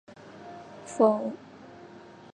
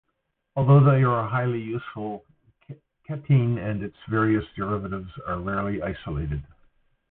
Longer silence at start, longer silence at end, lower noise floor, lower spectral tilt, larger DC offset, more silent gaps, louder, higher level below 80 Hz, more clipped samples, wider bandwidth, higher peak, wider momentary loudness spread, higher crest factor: second, 0.25 s vs 0.55 s; second, 0.35 s vs 0.65 s; second, -49 dBFS vs -77 dBFS; second, -6.5 dB/octave vs -12.5 dB/octave; neither; neither; about the same, -26 LUFS vs -24 LUFS; second, -76 dBFS vs -46 dBFS; neither; first, 10.5 kHz vs 3.9 kHz; about the same, -8 dBFS vs -6 dBFS; first, 25 LU vs 16 LU; about the same, 22 dB vs 18 dB